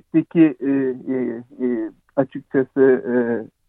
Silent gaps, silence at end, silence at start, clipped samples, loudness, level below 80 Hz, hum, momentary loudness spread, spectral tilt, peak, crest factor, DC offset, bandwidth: none; 0.25 s; 0.15 s; under 0.1%; -20 LUFS; -68 dBFS; none; 9 LU; -11 dB/octave; -4 dBFS; 16 dB; under 0.1%; 3.8 kHz